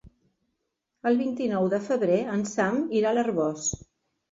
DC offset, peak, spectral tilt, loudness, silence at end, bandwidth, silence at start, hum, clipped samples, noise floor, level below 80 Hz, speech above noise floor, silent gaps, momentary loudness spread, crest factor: under 0.1%; -10 dBFS; -5 dB/octave; -26 LUFS; 0.55 s; 7.8 kHz; 0.05 s; none; under 0.1%; -80 dBFS; -58 dBFS; 55 dB; none; 6 LU; 16 dB